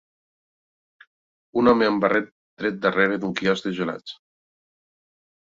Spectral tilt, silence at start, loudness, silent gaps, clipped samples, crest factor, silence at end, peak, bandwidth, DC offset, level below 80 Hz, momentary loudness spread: -6 dB/octave; 1.55 s; -22 LUFS; 2.32-2.57 s; under 0.1%; 22 dB; 1.45 s; -4 dBFS; 7.6 kHz; under 0.1%; -60 dBFS; 12 LU